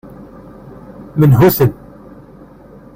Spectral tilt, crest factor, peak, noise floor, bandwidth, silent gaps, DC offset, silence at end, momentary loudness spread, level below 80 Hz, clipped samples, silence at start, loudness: -8 dB/octave; 14 dB; 0 dBFS; -39 dBFS; 16.5 kHz; none; under 0.1%; 1.25 s; 27 LU; -40 dBFS; under 0.1%; 0.2 s; -12 LUFS